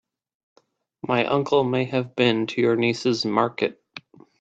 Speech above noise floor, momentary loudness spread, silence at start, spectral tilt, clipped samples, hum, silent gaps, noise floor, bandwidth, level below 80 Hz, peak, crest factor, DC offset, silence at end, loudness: 23 dB; 14 LU; 1.05 s; -6 dB/octave; under 0.1%; none; none; -45 dBFS; 8 kHz; -66 dBFS; -4 dBFS; 20 dB; under 0.1%; 0.4 s; -22 LUFS